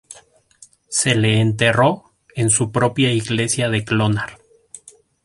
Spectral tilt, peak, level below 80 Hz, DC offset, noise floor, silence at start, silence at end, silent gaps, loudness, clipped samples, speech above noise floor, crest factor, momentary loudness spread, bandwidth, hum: -4 dB/octave; -2 dBFS; -50 dBFS; under 0.1%; -50 dBFS; 0.1 s; 0.5 s; none; -18 LUFS; under 0.1%; 33 dB; 18 dB; 8 LU; 11.5 kHz; none